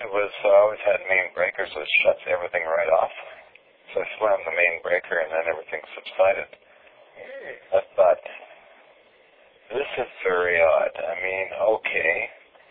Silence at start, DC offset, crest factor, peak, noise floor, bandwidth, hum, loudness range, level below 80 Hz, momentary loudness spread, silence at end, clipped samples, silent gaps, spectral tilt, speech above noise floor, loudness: 0 s; under 0.1%; 18 dB; -6 dBFS; -56 dBFS; 4.6 kHz; none; 5 LU; -64 dBFS; 15 LU; 0.35 s; under 0.1%; none; -6.5 dB/octave; 33 dB; -23 LUFS